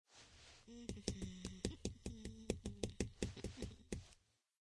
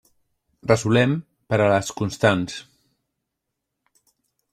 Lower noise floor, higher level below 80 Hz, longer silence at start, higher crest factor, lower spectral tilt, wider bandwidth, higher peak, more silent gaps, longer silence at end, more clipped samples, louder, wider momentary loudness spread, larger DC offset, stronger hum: second, -73 dBFS vs -81 dBFS; about the same, -58 dBFS vs -56 dBFS; second, 0.1 s vs 0.65 s; first, 28 dB vs 20 dB; about the same, -5 dB/octave vs -5.5 dB/octave; second, 12 kHz vs 14 kHz; second, -22 dBFS vs -4 dBFS; neither; second, 0.4 s vs 1.9 s; neither; second, -49 LUFS vs -21 LUFS; first, 16 LU vs 13 LU; neither; neither